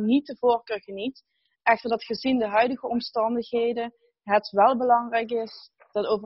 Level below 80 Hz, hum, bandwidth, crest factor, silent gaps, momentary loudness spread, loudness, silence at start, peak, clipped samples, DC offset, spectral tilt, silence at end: -68 dBFS; none; 6 kHz; 18 dB; none; 13 LU; -25 LUFS; 0 s; -6 dBFS; under 0.1%; under 0.1%; -2.5 dB/octave; 0 s